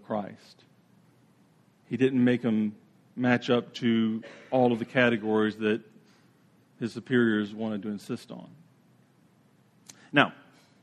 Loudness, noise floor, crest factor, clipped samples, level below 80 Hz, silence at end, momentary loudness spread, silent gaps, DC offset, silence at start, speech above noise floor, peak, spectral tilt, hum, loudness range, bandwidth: -27 LUFS; -62 dBFS; 26 dB; under 0.1%; -74 dBFS; 0.5 s; 13 LU; none; under 0.1%; 0.1 s; 36 dB; -4 dBFS; -6.5 dB/octave; none; 6 LU; 9.8 kHz